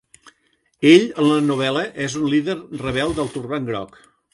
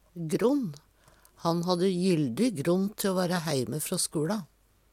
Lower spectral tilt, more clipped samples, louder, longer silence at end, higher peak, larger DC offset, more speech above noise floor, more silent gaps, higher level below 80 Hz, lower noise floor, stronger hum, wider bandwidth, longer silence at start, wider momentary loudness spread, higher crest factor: about the same, -5.5 dB/octave vs -5.5 dB/octave; neither; first, -19 LUFS vs -28 LUFS; about the same, 0.45 s vs 0.45 s; first, -2 dBFS vs -12 dBFS; neither; first, 46 dB vs 32 dB; neither; first, -50 dBFS vs -66 dBFS; first, -64 dBFS vs -60 dBFS; neither; second, 11.5 kHz vs 16.5 kHz; first, 0.8 s vs 0.15 s; first, 13 LU vs 6 LU; about the same, 18 dB vs 16 dB